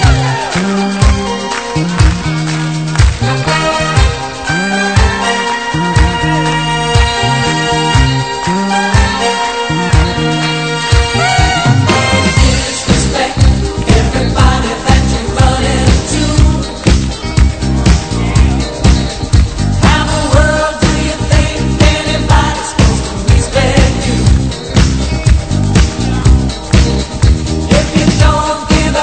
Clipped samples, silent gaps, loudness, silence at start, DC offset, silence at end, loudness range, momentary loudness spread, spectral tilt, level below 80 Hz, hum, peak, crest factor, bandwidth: 0.3%; none; -11 LUFS; 0 s; 0.9%; 0 s; 2 LU; 4 LU; -5 dB/octave; -16 dBFS; none; 0 dBFS; 10 dB; 9.2 kHz